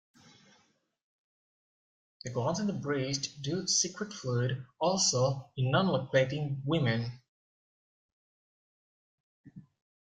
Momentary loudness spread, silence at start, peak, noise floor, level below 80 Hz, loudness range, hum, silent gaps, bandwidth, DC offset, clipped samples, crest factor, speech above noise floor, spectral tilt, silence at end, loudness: 8 LU; 2.25 s; -14 dBFS; -71 dBFS; -68 dBFS; 8 LU; none; 7.28-9.44 s; 9.6 kHz; under 0.1%; under 0.1%; 20 dB; 40 dB; -4 dB/octave; 0.4 s; -31 LUFS